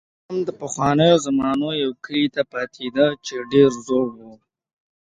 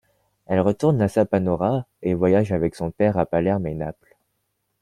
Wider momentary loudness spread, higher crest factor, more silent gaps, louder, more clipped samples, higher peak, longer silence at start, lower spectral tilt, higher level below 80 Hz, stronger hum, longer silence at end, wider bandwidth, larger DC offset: first, 11 LU vs 7 LU; about the same, 18 dB vs 18 dB; neither; about the same, -20 LUFS vs -22 LUFS; neither; about the same, -2 dBFS vs -4 dBFS; second, 0.3 s vs 0.5 s; second, -5.5 dB/octave vs -8.5 dB/octave; second, -56 dBFS vs -50 dBFS; neither; about the same, 0.8 s vs 0.9 s; second, 9.4 kHz vs 12 kHz; neither